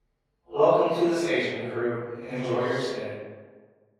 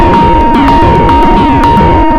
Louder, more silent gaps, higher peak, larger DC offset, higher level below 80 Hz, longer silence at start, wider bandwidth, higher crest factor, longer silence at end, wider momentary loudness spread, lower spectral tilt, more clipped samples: second, -26 LUFS vs -6 LUFS; neither; second, -8 dBFS vs 0 dBFS; neither; second, -72 dBFS vs -14 dBFS; first, 0.5 s vs 0 s; first, 13 kHz vs 11.5 kHz; first, 20 dB vs 4 dB; first, 0.55 s vs 0 s; first, 14 LU vs 1 LU; second, -6 dB/octave vs -7.5 dB/octave; second, under 0.1% vs 4%